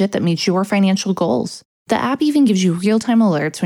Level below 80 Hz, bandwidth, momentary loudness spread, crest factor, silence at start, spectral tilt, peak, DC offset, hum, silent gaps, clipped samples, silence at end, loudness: -60 dBFS; 13.5 kHz; 7 LU; 14 dB; 0 s; -6 dB/octave; -2 dBFS; under 0.1%; none; 1.65-1.86 s; under 0.1%; 0 s; -16 LUFS